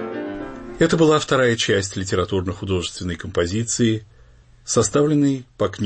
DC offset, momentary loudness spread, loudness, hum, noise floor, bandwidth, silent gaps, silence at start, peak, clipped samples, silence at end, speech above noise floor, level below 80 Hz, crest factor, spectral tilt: under 0.1%; 12 LU; -20 LUFS; none; -49 dBFS; 8.8 kHz; none; 0 s; -4 dBFS; under 0.1%; 0 s; 29 dB; -46 dBFS; 16 dB; -4.5 dB/octave